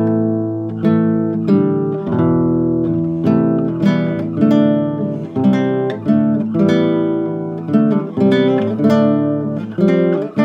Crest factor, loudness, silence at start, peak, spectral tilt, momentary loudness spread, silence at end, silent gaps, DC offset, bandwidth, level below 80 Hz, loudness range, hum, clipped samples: 14 dB; -16 LUFS; 0 s; -2 dBFS; -9.5 dB/octave; 6 LU; 0 s; none; under 0.1%; 7 kHz; -54 dBFS; 1 LU; none; under 0.1%